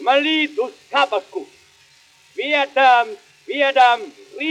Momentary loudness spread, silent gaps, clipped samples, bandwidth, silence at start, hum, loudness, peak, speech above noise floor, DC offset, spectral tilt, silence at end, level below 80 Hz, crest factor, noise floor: 19 LU; none; under 0.1%; 10.5 kHz; 0 s; none; -17 LUFS; -2 dBFS; 35 dB; under 0.1%; -1.5 dB/octave; 0 s; -78 dBFS; 18 dB; -52 dBFS